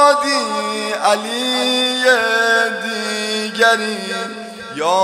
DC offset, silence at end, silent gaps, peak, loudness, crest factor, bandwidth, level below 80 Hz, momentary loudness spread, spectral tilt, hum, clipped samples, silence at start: under 0.1%; 0 s; none; 0 dBFS; -16 LUFS; 16 dB; 16 kHz; -68 dBFS; 10 LU; -1.5 dB/octave; none; under 0.1%; 0 s